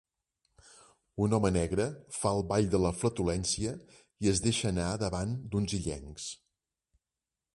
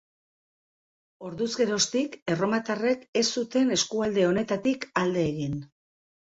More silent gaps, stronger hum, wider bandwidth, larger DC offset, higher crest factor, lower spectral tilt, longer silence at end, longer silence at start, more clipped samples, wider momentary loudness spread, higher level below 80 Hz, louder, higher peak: second, none vs 2.22-2.26 s, 3.08-3.13 s; neither; first, 11.5 kHz vs 8 kHz; neither; about the same, 20 dB vs 18 dB; about the same, -5 dB/octave vs -4 dB/octave; first, 1.2 s vs 0.75 s; about the same, 1.15 s vs 1.2 s; neither; first, 12 LU vs 8 LU; first, -48 dBFS vs -62 dBFS; second, -31 LUFS vs -26 LUFS; second, -14 dBFS vs -10 dBFS